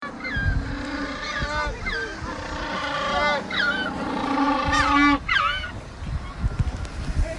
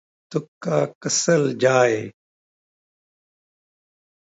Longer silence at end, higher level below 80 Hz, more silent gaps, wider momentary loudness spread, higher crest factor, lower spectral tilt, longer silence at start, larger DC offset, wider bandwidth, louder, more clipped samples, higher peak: second, 0 s vs 2.15 s; first, -34 dBFS vs -70 dBFS; second, none vs 0.48-0.61 s, 0.95-1.01 s; about the same, 12 LU vs 12 LU; about the same, 18 dB vs 20 dB; about the same, -5 dB/octave vs -4 dB/octave; second, 0 s vs 0.3 s; neither; first, 11.5 kHz vs 8.2 kHz; second, -24 LUFS vs -21 LUFS; neither; about the same, -6 dBFS vs -4 dBFS